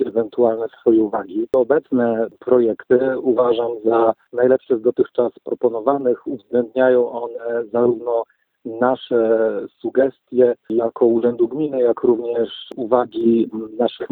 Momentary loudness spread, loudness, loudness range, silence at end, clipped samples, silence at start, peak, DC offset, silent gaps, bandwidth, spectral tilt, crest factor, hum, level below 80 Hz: 7 LU; -19 LUFS; 2 LU; 0.05 s; under 0.1%; 0 s; -2 dBFS; under 0.1%; none; 4.2 kHz; -9.5 dB/octave; 18 dB; none; -62 dBFS